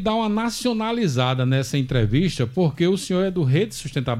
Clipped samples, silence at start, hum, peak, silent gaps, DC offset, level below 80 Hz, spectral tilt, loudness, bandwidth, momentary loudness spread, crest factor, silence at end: under 0.1%; 0 s; none; -6 dBFS; none; under 0.1%; -42 dBFS; -6 dB/octave; -22 LUFS; 13.5 kHz; 3 LU; 16 dB; 0 s